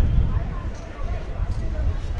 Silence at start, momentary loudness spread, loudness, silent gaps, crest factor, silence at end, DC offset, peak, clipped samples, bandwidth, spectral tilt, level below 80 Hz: 0 s; 9 LU; -28 LUFS; none; 16 dB; 0 s; under 0.1%; -8 dBFS; under 0.1%; 7.2 kHz; -8 dB/octave; -26 dBFS